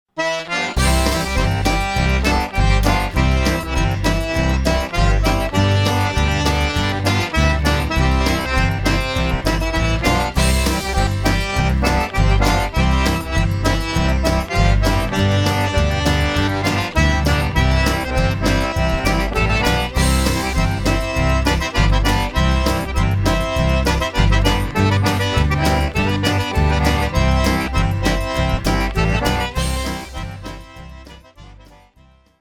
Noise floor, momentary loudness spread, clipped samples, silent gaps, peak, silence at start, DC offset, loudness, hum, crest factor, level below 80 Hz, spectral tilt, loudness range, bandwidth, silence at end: -51 dBFS; 3 LU; under 0.1%; none; -2 dBFS; 0.15 s; under 0.1%; -18 LUFS; none; 16 dB; -22 dBFS; -5 dB/octave; 1 LU; 19 kHz; 0.9 s